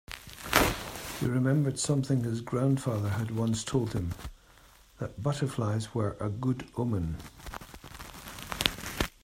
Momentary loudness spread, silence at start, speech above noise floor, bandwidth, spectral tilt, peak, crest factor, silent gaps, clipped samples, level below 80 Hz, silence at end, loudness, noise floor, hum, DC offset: 17 LU; 0.1 s; 27 dB; 16 kHz; -5 dB/octave; 0 dBFS; 30 dB; none; under 0.1%; -48 dBFS; 0.15 s; -30 LUFS; -57 dBFS; none; under 0.1%